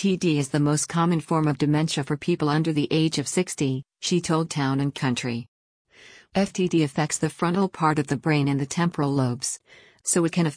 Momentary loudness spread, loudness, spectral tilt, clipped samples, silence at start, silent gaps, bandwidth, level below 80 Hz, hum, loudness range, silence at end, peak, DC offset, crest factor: 5 LU; -24 LUFS; -5 dB/octave; under 0.1%; 0 s; 5.48-5.85 s; 10.5 kHz; -60 dBFS; none; 3 LU; 0 s; -8 dBFS; under 0.1%; 16 dB